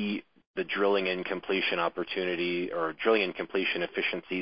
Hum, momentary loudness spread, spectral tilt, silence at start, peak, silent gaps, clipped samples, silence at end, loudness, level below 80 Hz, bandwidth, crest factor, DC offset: none; 7 LU; -8.5 dB/octave; 0 s; -12 dBFS; 0.47-0.54 s; under 0.1%; 0 s; -29 LUFS; -72 dBFS; 5.6 kHz; 18 dB; 0.1%